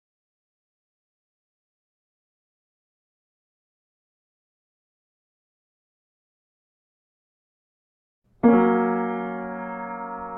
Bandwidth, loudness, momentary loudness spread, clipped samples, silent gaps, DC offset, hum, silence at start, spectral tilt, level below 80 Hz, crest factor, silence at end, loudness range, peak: 3.4 kHz; -23 LUFS; 15 LU; under 0.1%; none; under 0.1%; none; 8.45 s; -11 dB/octave; -68 dBFS; 24 dB; 0 s; 2 LU; -6 dBFS